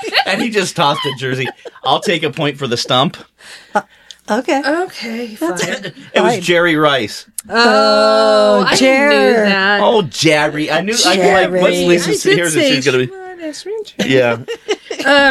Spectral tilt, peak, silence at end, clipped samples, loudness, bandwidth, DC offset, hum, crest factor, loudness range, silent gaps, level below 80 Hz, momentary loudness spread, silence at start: -3.5 dB/octave; 0 dBFS; 0 s; under 0.1%; -13 LUFS; 14.5 kHz; under 0.1%; none; 14 dB; 7 LU; none; -52 dBFS; 12 LU; 0 s